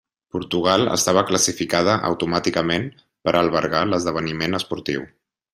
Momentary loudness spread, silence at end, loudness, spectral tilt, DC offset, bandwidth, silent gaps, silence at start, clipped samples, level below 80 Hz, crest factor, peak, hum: 10 LU; 0.45 s; -20 LUFS; -3.5 dB/octave; under 0.1%; 15.5 kHz; none; 0.35 s; under 0.1%; -54 dBFS; 20 dB; -2 dBFS; none